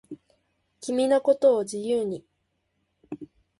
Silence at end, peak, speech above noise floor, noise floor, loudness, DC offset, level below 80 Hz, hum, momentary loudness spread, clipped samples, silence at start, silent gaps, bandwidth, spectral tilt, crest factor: 0.35 s; -10 dBFS; 52 dB; -75 dBFS; -24 LUFS; under 0.1%; -70 dBFS; none; 22 LU; under 0.1%; 0.1 s; none; 11.5 kHz; -5 dB/octave; 18 dB